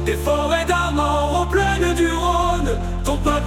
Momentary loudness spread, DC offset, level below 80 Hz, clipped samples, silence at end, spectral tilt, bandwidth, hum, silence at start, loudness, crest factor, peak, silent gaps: 4 LU; under 0.1%; -26 dBFS; under 0.1%; 0 s; -5 dB/octave; 16.5 kHz; none; 0 s; -19 LUFS; 12 dB; -6 dBFS; none